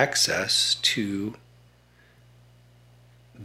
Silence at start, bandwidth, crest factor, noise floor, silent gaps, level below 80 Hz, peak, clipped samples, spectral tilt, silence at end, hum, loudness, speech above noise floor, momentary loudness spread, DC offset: 0 s; 16 kHz; 22 dB; -58 dBFS; none; -64 dBFS; -6 dBFS; under 0.1%; -1.5 dB/octave; 0 s; 60 Hz at -55 dBFS; -23 LUFS; 33 dB; 11 LU; under 0.1%